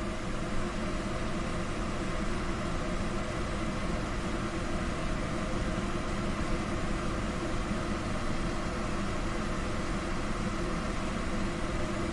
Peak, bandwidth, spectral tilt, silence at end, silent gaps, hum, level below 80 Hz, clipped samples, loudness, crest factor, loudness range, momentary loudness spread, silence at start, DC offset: -20 dBFS; 11.5 kHz; -5.5 dB/octave; 0 s; none; none; -36 dBFS; under 0.1%; -34 LUFS; 12 dB; 1 LU; 1 LU; 0 s; under 0.1%